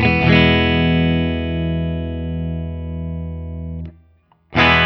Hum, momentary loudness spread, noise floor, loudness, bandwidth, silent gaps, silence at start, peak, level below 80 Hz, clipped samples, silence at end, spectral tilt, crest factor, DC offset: none; 16 LU; -55 dBFS; -18 LUFS; 6.2 kHz; none; 0 s; 0 dBFS; -30 dBFS; under 0.1%; 0 s; -7.5 dB/octave; 18 dB; under 0.1%